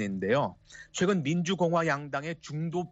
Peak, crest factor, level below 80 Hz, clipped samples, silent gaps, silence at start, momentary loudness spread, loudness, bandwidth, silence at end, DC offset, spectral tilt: -14 dBFS; 16 dB; -66 dBFS; under 0.1%; none; 0 s; 9 LU; -29 LUFS; 8 kHz; 0.05 s; under 0.1%; -5.5 dB/octave